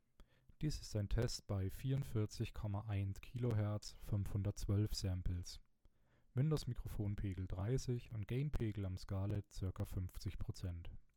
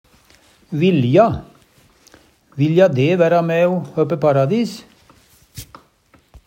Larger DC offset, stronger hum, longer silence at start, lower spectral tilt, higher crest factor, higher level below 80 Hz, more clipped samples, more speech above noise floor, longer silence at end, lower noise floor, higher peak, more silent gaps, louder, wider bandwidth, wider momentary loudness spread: neither; neither; second, 0.2 s vs 0.7 s; about the same, -6.5 dB/octave vs -7.5 dB/octave; about the same, 16 dB vs 18 dB; about the same, -52 dBFS vs -52 dBFS; neither; second, 30 dB vs 40 dB; second, 0.1 s vs 0.85 s; first, -71 dBFS vs -55 dBFS; second, -26 dBFS vs 0 dBFS; neither; second, -43 LUFS vs -16 LUFS; about the same, 17 kHz vs 16 kHz; second, 8 LU vs 23 LU